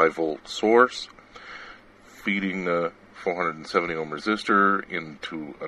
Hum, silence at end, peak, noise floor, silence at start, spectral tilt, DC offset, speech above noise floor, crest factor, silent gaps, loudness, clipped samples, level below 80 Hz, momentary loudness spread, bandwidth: none; 0 s; -2 dBFS; -50 dBFS; 0 s; -5 dB/octave; under 0.1%; 25 dB; 24 dB; none; -25 LUFS; under 0.1%; -62 dBFS; 21 LU; 12 kHz